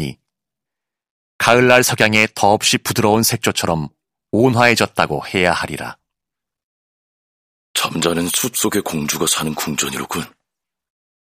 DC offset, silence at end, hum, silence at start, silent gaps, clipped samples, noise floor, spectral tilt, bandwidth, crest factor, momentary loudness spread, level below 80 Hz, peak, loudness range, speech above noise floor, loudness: under 0.1%; 1 s; none; 0 s; 1.10-1.39 s, 6.64-7.74 s; 0.2%; -85 dBFS; -3.5 dB/octave; 18 kHz; 18 dB; 12 LU; -50 dBFS; 0 dBFS; 7 LU; 69 dB; -16 LUFS